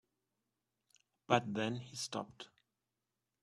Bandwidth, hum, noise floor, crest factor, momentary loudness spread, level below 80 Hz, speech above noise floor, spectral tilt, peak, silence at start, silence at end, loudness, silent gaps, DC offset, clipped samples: 12.5 kHz; none; -89 dBFS; 28 dB; 19 LU; -80 dBFS; 51 dB; -4.5 dB/octave; -14 dBFS; 1.3 s; 0.95 s; -38 LUFS; none; under 0.1%; under 0.1%